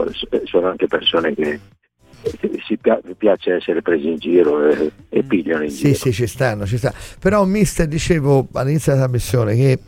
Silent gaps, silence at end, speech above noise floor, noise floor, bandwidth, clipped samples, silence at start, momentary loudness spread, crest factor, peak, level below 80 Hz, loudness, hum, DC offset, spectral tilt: none; 0.1 s; 31 dB; -48 dBFS; 16.5 kHz; under 0.1%; 0 s; 7 LU; 16 dB; -2 dBFS; -38 dBFS; -18 LUFS; none; under 0.1%; -6 dB/octave